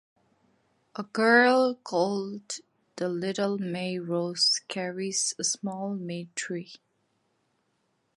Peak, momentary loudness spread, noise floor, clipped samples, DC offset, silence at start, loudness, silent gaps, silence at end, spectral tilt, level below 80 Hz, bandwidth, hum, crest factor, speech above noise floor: -6 dBFS; 16 LU; -74 dBFS; under 0.1%; under 0.1%; 0.95 s; -27 LUFS; none; 1.4 s; -3 dB/octave; -80 dBFS; 11.5 kHz; none; 22 dB; 46 dB